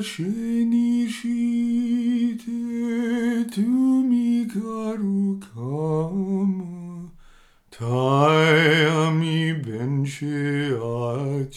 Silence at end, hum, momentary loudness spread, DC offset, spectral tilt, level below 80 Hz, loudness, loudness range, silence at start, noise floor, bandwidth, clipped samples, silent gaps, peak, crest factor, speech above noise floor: 0 s; none; 11 LU; under 0.1%; -6.5 dB/octave; -60 dBFS; -22 LUFS; 6 LU; 0 s; -52 dBFS; 12.5 kHz; under 0.1%; none; -4 dBFS; 18 dB; 30 dB